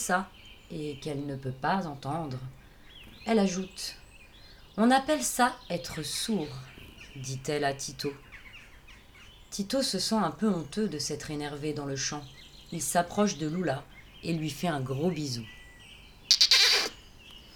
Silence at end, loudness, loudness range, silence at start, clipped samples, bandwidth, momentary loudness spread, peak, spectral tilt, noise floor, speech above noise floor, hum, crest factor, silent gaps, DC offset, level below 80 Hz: 0 s; -29 LUFS; 9 LU; 0 s; under 0.1%; over 20 kHz; 23 LU; -2 dBFS; -3.5 dB/octave; -52 dBFS; 22 dB; none; 30 dB; none; under 0.1%; -56 dBFS